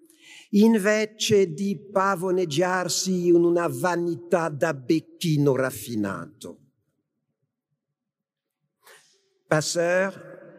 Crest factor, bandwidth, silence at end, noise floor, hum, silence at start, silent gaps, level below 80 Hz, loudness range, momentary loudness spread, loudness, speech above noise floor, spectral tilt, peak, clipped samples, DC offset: 22 dB; 15.5 kHz; 0.1 s; -86 dBFS; none; 0.3 s; none; -74 dBFS; 11 LU; 10 LU; -23 LUFS; 63 dB; -5 dB/octave; -4 dBFS; under 0.1%; under 0.1%